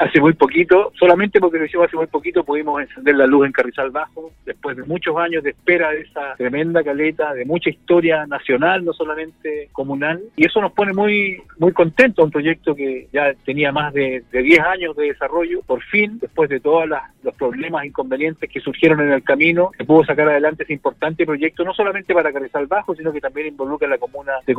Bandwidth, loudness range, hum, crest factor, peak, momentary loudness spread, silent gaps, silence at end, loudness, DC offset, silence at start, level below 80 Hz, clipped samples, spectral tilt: 7.4 kHz; 4 LU; none; 18 dB; 0 dBFS; 11 LU; none; 0 s; -17 LUFS; under 0.1%; 0 s; -52 dBFS; under 0.1%; -7.5 dB/octave